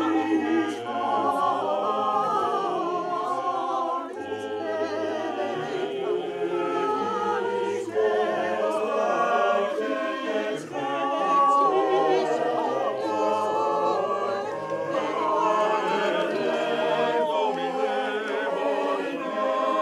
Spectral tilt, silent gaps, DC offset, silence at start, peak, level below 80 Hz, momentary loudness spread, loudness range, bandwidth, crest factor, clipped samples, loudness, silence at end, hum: -4.5 dB/octave; none; under 0.1%; 0 s; -10 dBFS; -74 dBFS; 6 LU; 4 LU; 12.5 kHz; 14 dB; under 0.1%; -25 LUFS; 0 s; none